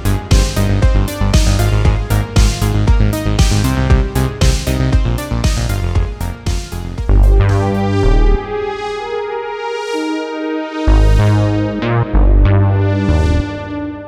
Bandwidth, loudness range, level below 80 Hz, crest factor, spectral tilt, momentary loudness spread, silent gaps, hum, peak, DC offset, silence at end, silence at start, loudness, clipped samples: 16 kHz; 3 LU; -16 dBFS; 12 dB; -6 dB/octave; 9 LU; none; none; 0 dBFS; under 0.1%; 0 s; 0 s; -15 LUFS; under 0.1%